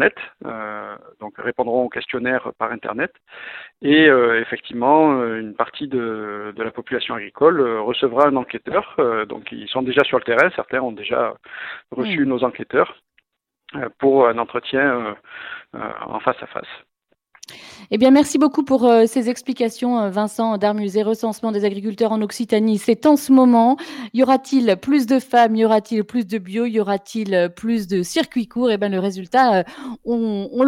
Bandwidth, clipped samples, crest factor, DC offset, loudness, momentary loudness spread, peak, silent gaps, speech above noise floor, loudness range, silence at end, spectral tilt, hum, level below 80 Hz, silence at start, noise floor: 16 kHz; under 0.1%; 18 dB; under 0.1%; -19 LUFS; 16 LU; 0 dBFS; none; 46 dB; 5 LU; 0 s; -5 dB/octave; none; -62 dBFS; 0 s; -65 dBFS